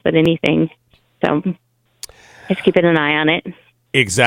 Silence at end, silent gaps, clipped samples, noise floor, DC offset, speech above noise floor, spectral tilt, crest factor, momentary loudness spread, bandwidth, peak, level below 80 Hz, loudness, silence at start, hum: 0 s; none; under 0.1%; -40 dBFS; under 0.1%; 24 dB; -5 dB/octave; 18 dB; 21 LU; 16 kHz; 0 dBFS; -52 dBFS; -17 LUFS; 0.05 s; none